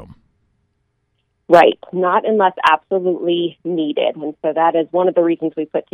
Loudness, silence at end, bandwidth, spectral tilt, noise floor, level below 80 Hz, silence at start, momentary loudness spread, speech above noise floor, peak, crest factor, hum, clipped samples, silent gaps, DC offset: -16 LUFS; 0.1 s; 9.2 kHz; -6.5 dB/octave; -68 dBFS; -62 dBFS; 0 s; 10 LU; 52 dB; 0 dBFS; 18 dB; none; under 0.1%; none; under 0.1%